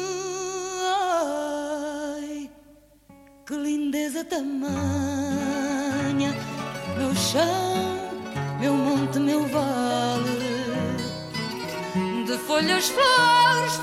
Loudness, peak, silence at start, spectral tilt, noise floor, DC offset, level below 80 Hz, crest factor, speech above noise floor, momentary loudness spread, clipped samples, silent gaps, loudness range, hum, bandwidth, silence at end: -25 LUFS; -8 dBFS; 0 s; -4 dB/octave; -53 dBFS; under 0.1%; -58 dBFS; 16 dB; 31 dB; 11 LU; under 0.1%; none; 6 LU; none; 16 kHz; 0 s